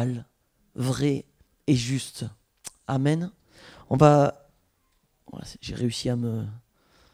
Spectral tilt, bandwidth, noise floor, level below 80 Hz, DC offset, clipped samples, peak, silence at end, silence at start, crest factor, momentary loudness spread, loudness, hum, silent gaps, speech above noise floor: -6.5 dB/octave; 15 kHz; -69 dBFS; -54 dBFS; under 0.1%; under 0.1%; -2 dBFS; 0.55 s; 0 s; 24 dB; 22 LU; -25 LUFS; none; none; 45 dB